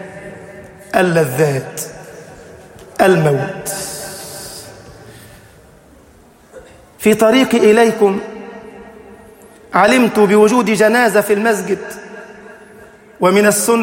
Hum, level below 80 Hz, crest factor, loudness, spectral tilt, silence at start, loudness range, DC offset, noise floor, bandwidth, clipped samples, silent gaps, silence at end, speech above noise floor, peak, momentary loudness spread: none; -52 dBFS; 16 dB; -13 LUFS; -4.5 dB/octave; 0 s; 8 LU; under 0.1%; -45 dBFS; 16.5 kHz; under 0.1%; none; 0 s; 33 dB; 0 dBFS; 23 LU